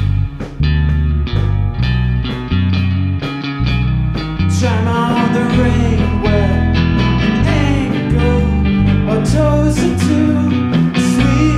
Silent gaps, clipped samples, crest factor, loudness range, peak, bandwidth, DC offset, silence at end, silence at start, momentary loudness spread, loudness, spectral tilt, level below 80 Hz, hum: none; under 0.1%; 12 dB; 3 LU; 0 dBFS; 12.5 kHz; under 0.1%; 0 s; 0 s; 5 LU; -14 LUFS; -7 dB/octave; -20 dBFS; none